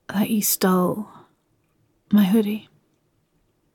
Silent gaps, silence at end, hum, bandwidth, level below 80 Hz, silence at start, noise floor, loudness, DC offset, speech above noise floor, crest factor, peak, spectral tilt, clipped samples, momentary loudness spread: none; 1.15 s; none; 17.5 kHz; -66 dBFS; 0.1 s; -67 dBFS; -21 LUFS; under 0.1%; 47 dB; 16 dB; -8 dBFS; -5 dB/octave; under 0.1%; 14 LU